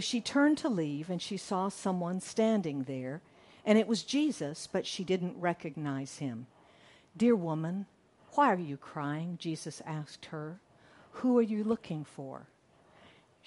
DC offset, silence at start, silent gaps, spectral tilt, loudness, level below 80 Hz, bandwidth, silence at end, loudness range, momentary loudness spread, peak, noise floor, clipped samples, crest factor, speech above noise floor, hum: under 0.1%; 0 s; none; -5.5 dB/octave; -33 LUFS; -76 dBFS; 11.5 kHz; 1.05 s; 3 LU; 15 LU; -12 dBFS; -63 dBFS; under 0.1%; 22 dB; 31 dB; none